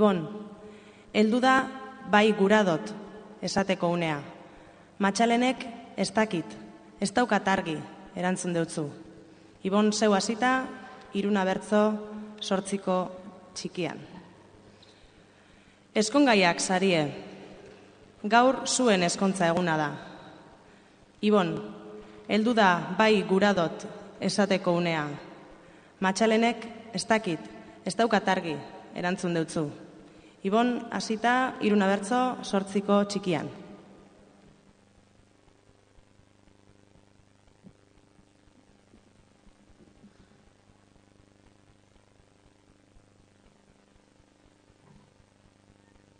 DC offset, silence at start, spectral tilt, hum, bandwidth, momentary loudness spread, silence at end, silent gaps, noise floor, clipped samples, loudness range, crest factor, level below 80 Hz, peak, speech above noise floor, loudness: under 0.1%; 0 s; -4.5 dB/octave; none; 10 kHz; 20 LU; 12.4 s; none; -61 dBFS; under 0.1%; 5 LU; 22 dB; -66 dBFS; -6 dBFS; 35 dB; -26 LUFS